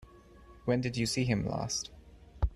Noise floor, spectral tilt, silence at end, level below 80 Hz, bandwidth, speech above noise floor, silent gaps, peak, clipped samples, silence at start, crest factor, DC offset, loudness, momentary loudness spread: -55 dBFS; -5 dB/octave; 0 s; -44 dBFS; 13 kHz; 24 dB; none; -16 dBFS; under 0.1%; 0 s; 18 dB; under 0.1%; -33 LUFS; 8 LU